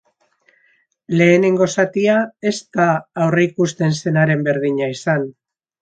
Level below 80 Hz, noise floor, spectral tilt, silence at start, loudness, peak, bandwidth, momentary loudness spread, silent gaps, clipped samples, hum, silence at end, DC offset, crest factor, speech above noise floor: -62 dBFS; -60 dBFS; -6 dB/octave; 1.1 s; -17 LUFS; -2 dBFS; 9 kHz; 8 LU; none; under 0.1%; none; 0.5 s; under 0.1%; 16 dB; 44 dB